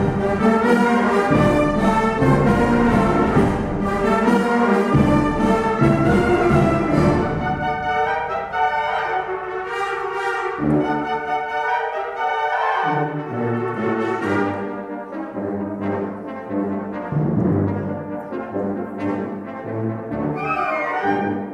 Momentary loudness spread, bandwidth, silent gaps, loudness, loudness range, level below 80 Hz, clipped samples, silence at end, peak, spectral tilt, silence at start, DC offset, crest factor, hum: 10 LU; 13.5 kHz; none; -20 LUFS; 7 LU; -38 dBFS; under 0.1%; 0 s; -4 dBFS; -7.5 dB/octave; 0 s; under 0.1%; 14 dB; none